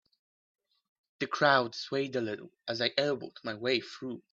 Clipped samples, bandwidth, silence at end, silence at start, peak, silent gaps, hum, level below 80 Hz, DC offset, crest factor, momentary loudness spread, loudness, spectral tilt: under 0.1%; 7.8 kHz; 0.15 s; 1.2 s; -10 dBFS; none; none; -78 dBFS; under 0.1%; 24 dB; 15 LU; -31 LUFS; -4.5 dB/octave